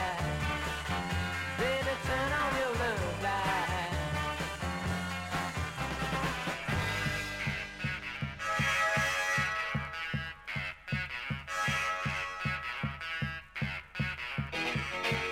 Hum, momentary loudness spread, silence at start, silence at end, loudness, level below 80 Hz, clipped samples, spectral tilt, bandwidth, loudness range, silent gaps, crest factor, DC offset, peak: none; 7 LU; 0 s; 0 s; -33 LUFS; -48 dBFS; under 0.1%; -4.5 dB/octave; 16 kHz; 3 LU; none; 16 dB; under 0.1%; -18 dBFS